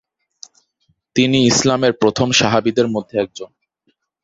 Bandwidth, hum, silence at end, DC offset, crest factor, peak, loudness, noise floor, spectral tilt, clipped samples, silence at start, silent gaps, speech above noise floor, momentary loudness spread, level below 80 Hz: 8 kHz; none; 0.8 s; under 0.1%; 18 dB; 0 dBFS; -16 LUFS; -66 dBFS; -4 dB/octave; under 0.1%; 1.15 s; none; 51 dB; 11 LU; -50 dBFS